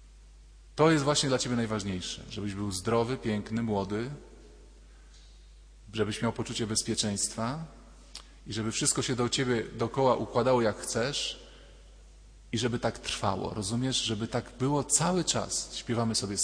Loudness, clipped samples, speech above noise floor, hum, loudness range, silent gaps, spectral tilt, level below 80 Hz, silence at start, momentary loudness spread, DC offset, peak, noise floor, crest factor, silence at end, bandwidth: -30 LUFS; under 0.1%; 23 dB; none; 5 LU; none; -4 dB/octave; -52 dBFS; 0 s; 11 LU; under 0.1%; -10 dBFS; -52 dBFS; 20 dB; 0 s; 11 kHz